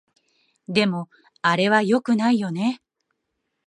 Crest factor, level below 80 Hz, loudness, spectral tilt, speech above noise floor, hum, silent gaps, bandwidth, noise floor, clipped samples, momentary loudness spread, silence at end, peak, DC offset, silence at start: 20 dB; -70 dBFS; -21 LUFS; -5.5 dB/octave; 57 dB; none; none; 11 kHz; -77 dBFS; under 0.1%; 12 LU; 0.9 s; -4 dBFS; under 0.1%; 0.7 s